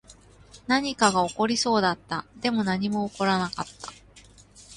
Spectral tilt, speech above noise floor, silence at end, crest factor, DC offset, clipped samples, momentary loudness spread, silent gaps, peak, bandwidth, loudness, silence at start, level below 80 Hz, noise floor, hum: -4 dB/octave; 27 dB; 0 s; 22 dB; under 0.1%; under 0.1%; 14 LU; none; -6 dBFS; 11.5 kHz; -25 LUFS; 0.1 s; -58 dBFS; -52 dBFS; none